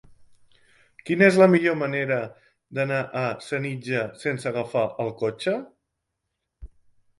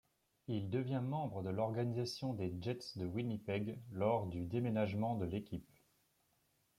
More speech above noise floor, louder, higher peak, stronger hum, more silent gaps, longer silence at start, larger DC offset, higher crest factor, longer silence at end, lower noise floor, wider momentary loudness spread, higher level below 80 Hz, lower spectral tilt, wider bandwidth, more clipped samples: first, 57 dB vs 39 dB; first, -24 LUFS vs -40 LUFS; first, -4 dBFS vs -22 dBFS; neither; neither; second, 0.2 s vs 0.5 s; neither; about the same, 22 dB vs 18 dB; second, 0.55 s vs 1.15 s; about the same, -80 dBFS vs -78 dBFS; first, 12 LU vs 7 LU; first, -58 dBFS vs -70 dBFS; about the same, -6.5 dB/octave vs -7.5 dB/octave; second, 11.5 kHz vs 15.5 kHz; neither